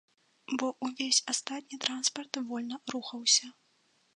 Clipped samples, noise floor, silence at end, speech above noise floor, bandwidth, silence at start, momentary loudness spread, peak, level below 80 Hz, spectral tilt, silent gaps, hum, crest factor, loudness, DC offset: under 0.1%; -71 dBFS; 0.65 s; 38 dB; 11.5 kHz; 0.5 s; 12 LU; -10 dBFS; -88 dBFS; 0 dB/octave; none; none; 24 dB; -30 LUFS; under 0.1%